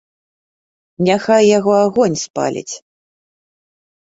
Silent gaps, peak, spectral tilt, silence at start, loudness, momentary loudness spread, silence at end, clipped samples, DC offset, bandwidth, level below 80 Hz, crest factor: 2.30-2.34 s; -2 dBFS; -5 dB/octave; 1 s; -14 LUFS; 15 LU; 1.4 s; under 0.1%; under 0.1%; 8 kHz; -60 dBFS; 16 dB